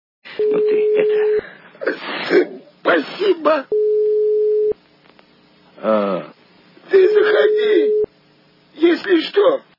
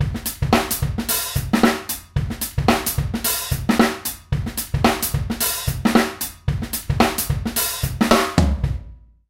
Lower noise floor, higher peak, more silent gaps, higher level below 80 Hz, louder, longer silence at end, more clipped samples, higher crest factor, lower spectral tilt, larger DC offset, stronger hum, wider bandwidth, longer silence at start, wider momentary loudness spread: first, -53 dBFS vs -41 dBFS; about the same, -2 dBFS vs 0 dBFS; neither; second, -66 dBFS vs -30 dBFS; first, -17 LUFS vs -20 LUFS; about the same, 0.2 s vs 0.3 s; neither; about the same, 16 dB vs 20 dB; first, -6.5 dB/octave vs -4.5 dB/octave; neither; neither; second, 5.8 kHz vs 17 kHz; first, 0.25 s vs 0 s; about the same, 10 LU vs 8 LU